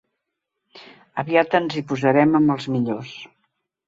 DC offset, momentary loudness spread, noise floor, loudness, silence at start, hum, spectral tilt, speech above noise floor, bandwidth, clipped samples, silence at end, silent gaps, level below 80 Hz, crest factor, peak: under 0.1%; 15 LU; -80 dBFS; -20 LUFS; 0.75 s; none; -7 dB/octave; 60 dB; 7.8 kHz; under 0.1%; 0.6 s; none; -62 dBFS; 20 dB; -2 dBFS